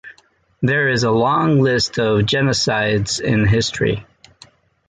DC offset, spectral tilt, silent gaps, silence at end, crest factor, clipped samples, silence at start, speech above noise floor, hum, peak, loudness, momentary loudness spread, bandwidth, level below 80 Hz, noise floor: under 0.1%; -5 dB/octave; none; 0.85 s; 14 dB; under 0.1%; 0.05 s; 39 dB; none; -4 dBFS; -17 LUFS; 5 LU; 9.4 kHz; -42 dBFS; -56 dBFS